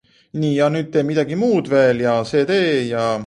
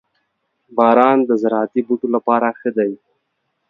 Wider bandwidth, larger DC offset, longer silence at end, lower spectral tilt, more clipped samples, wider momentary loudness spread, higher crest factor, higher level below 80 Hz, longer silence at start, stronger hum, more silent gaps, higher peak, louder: first, 11 kHz vs 5.8 kHz; neither; second, 0 s vs 0.75 s; second, -6.5 dB/octave vs -8 dB/octave; neither; second, 5 LU vs 10 LU; about the same, 14 dB vs 18 dB; first, -56 dBFS vs -68 dBFS; second, 0.35 s vs 0.7 s; neither; neither; second, -4 dBFS vs 0 dBFS; about the same, -18 LUFS vs -16 LUFS